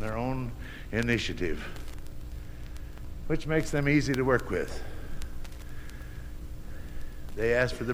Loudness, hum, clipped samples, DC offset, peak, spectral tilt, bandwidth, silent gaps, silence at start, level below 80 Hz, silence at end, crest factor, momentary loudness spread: -29 LUFS; none; under 0.1%; under 0.1%; -10 dBFS; -6 dB/octave; 16.5 kHz; none; 0 s; -40 dBFS; 0 s; 20 dB; 18 LU